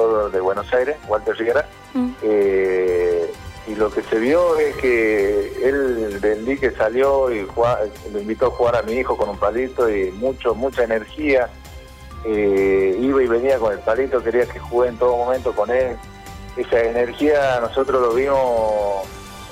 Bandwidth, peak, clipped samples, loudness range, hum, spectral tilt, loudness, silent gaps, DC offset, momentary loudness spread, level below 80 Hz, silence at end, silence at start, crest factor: 15.5 kHz; -8 dBFS; under 0.1%; 2 LU; none; -6 dB/octave; -19 LUFS; none; under 0.1%; 9 LU; -40 dBFS; 0 s; 0 s; 12 dB